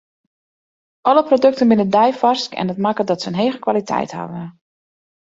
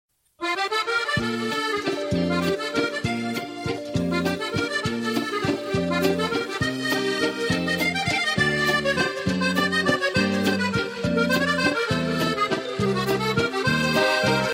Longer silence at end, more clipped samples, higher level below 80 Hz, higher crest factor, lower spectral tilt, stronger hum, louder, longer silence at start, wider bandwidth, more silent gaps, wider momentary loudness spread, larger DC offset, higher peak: first, 0.9 s vs 0 s; neither; second, -62 dBFS vs -50 dBFS; about the same, 16 dB vs 16 dB; first, -6 dB/octave vs -4.5 dB/octave; neither; first, -17 LUFS vs -23 LUFS; first, 1.05 s vs 0.4 s; second, 7.8 kHz vs 16 kHz; neither; first, 13 LU vs 5 LU; neither; first, -2 dBFS vs -8 dBFS